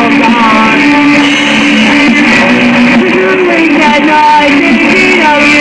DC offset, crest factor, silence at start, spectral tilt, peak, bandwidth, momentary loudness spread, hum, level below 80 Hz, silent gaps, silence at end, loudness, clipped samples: 0.6%; 6 dB; 0 s; -4 dB/octave; 0 dBFS; 10.5 kHz; 2 LU; none; -38 dBFS; none; 0 s; -5 LUFS; under 0.1%